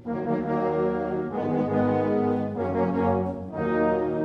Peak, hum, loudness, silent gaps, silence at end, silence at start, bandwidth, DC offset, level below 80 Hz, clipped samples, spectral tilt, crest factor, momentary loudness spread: -12 dBFS; none; -26 LUFS; none; 0 s; 0 s; 6 kHz; under 0.1%; -52 dBFS; under 0.1%; -10 dB/octave; 14 dB; 4 LU